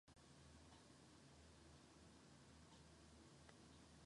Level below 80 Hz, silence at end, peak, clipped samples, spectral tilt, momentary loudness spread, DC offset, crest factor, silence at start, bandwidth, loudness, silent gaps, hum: -76 dBFS; 0 s; -48 dBFS; under 0.1%; -4 dB/octave; 1 LU; under 0.1%; 18 dB; 0.05 s; 11 kHz; -67 LUFS; none; none